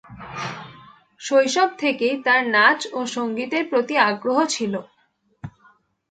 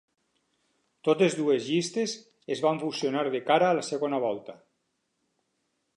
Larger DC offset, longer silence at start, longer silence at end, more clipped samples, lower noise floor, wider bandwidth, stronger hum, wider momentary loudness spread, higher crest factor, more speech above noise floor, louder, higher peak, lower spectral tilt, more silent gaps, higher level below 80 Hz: neither; second, 0.1 s vs 1.05 s; second, 0.6 s vs 1.45 s; neither; second, -65 dBFS vs -77 dBFS; second, 9.4 kHz vs 11.5 kHz; neither; first, 20 LU vs 10 LU; about the same, 20 dB vs 20 dB; second, 45 dB vs 51 dB; first, -20 LUFS vs -27 LUFS; first, -2 dBFS vs -8 dBFS; second, -3 dB/octave vs -4.5 dB/octave; neither; first, -64 dBFS vs -82 dBFS